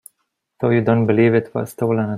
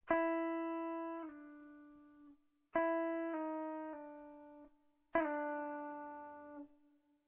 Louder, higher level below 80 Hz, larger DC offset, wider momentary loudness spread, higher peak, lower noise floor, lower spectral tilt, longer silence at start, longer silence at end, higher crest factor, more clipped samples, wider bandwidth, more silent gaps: first, -18 LUFS vs -41 LUFS; first, -58 dBFS vs -76 dBFS; neither; second, 8 LU vs 22 LU; first, -2 dBFS vs -20 dBFS; about the same, -72 dBFS vs -73 dBFS; first, -8.5 dB/octave vs -3.5 dB/octave; first, 0.6 s vs 0.05 s; second, 0 s vs 0.55 s; second, 16 dB vs 22 dB; neither; first, 15 kHz vs 3.8 kHz; neither